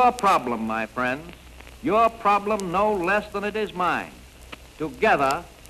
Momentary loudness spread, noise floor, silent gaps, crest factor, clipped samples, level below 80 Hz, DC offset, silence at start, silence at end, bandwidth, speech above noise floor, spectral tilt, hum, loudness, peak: 14 LU; -44 dBFS; none; 16 dB; under 0.1%; -48 dBFS; under 0.1%; 0 s; 0.15 s; 13 kHz; 21 dB; -5 dB/octave; none; -23 LUFS; -8 dBFS